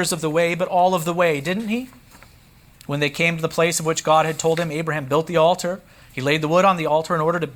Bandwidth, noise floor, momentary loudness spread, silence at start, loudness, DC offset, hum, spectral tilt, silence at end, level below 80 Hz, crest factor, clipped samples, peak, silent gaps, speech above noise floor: over 20 kHz; -50 dBFS; 9 LU; 0 s; -20 LUFS; under 0.1%; none; -4.5 dB/octave; 0 s; -56 dBFS; 16 dB; under 0.1%; -4 dBFS; none; 30 dB